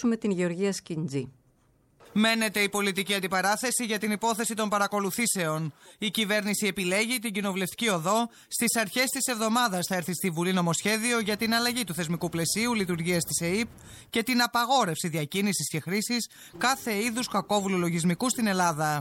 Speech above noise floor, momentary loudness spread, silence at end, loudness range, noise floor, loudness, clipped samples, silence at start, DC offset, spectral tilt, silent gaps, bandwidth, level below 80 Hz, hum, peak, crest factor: 37 dB; 6 LU; 0 s; 1 LU; -65 dBFS; -27 LUFS; under 0.1%; 0 s; under 0.1%; -3.5 dB/octave; none; 17 kHz; -64 dBFS; none; -12 dBFS; 16 dB